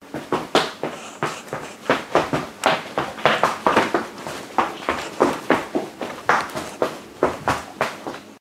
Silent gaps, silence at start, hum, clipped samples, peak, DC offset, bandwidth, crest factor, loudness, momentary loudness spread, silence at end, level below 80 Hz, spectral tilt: none; 0 s; none; under 0.1%; 0 dBFS; under 0.1%; 16 kHz; 24 dB; -23 LUFS; 12 LU; 0 s; -54 dBFS; -4 dB/octave